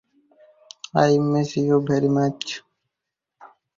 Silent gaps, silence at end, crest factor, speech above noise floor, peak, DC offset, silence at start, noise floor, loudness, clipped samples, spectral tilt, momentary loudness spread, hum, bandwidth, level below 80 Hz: none; 0.3 s; 20 dB; 65 dB; -4 dBFS; under 0.1%; 0.95 s; -84 dBFS; -21 LUFS; under 0.1%; -6.5 dB/octave; 13 LU; none; 7.6 kHz; -60 dBFS